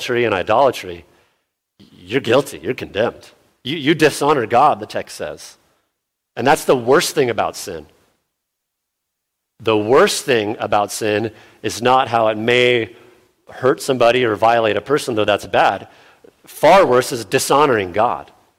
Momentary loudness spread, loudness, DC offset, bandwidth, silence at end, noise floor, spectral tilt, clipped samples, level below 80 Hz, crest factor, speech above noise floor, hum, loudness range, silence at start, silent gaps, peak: 15 LU; -16 LUFS; under 0.1%; 16.5 kHz; 0.35 s; -77 dBFS; -4 dB/octave; under 0.1%; -54 dBFS; 16 dB; 61 dB; none; 4 LU; 0 s; none; 0 dBFS